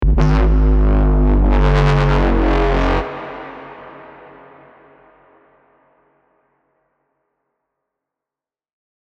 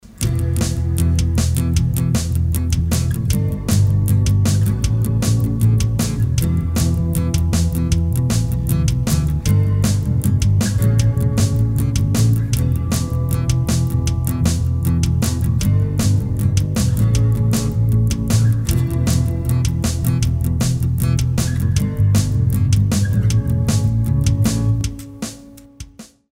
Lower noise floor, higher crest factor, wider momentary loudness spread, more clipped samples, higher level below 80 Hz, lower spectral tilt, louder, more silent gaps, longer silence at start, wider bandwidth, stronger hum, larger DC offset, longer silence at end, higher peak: first, -90 dBFS vs -39 dBFS; about the same, 18 dB vs 16 dB; first, 21 LU vs 3 LU; neither; first, -18 dBFS vs -26 dBFS; first, -8 dB/octave vs -6 dB/octave; first, -15 LUFS vs -18 LUFS; neither; about the same, 0 s vs 0.05 s; second, 6.4 kHz vs 16.5 kHz; neither; neither; first, 5 s vs 0.3 s; about the same, 0 dBFS vs -2 dBFS